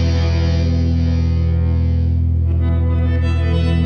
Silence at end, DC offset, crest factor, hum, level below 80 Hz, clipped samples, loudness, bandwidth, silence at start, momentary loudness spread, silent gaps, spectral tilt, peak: 0 s; under 0.1%; 10 dB; none; -20 dBFS; under 0.1%; -17 LUFS; 6.2 kHz; 0 s; 0 LU; none; -8 dB/octave; -6 dBFS